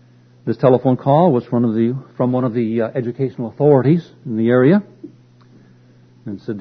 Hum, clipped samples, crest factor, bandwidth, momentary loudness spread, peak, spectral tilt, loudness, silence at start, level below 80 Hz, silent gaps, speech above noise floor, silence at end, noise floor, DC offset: none; under 0.1%; 18 dB; 6 kHz; 13 LU; 0 dBFS; -11 dB/octave; -17 LUFS; 0.45 s; -60 dBFS; none; 32 dB; 0 s; -48 dBFS; under 0.1%